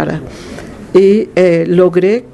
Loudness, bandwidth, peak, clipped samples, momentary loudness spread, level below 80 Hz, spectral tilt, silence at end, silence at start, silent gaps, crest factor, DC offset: -10 LUFS; 10.5 kHz; 0 dBFS; 0.1%; 19 LU; -42 dBFS; -7.5 dB/octave; 0.1 s; 0 s; none; 12 dB; under 0.1%